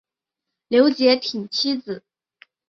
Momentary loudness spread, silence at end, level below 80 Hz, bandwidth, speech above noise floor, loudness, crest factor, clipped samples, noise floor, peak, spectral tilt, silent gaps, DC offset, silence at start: 15 LU; 0.7 s; -70 dBFS; 7.6 kHz; 65 dB; -19 LUFS; 18 dB; under 0.1%; -84 dBFS; -4 dBFS; -4 dB/octave; none; under 0.1%; 0.7 s